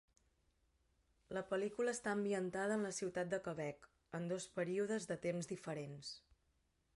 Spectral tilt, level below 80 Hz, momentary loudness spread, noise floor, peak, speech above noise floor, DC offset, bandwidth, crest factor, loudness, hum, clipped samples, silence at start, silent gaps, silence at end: -5 dB/octave; -78 dBFS; 10 LU; -80 dBFS; -28 dBFS; 38 dB; under 0.1%; 11.5 kHz; 16 dB; -43 LUFS; none; under 0.1%; 1.3 s; none; 0.75 s